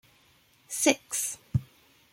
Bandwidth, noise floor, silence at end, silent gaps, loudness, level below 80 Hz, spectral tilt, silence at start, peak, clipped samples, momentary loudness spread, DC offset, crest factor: 16.5 kHz; -63 dBFS; 0.5 s; none; -28 LUFS; -56 dBFS; -3.5 dB/octave; 0.7 s; -6 dBFS; under 0.1%; 8 LU; under 0.1%; 26 dB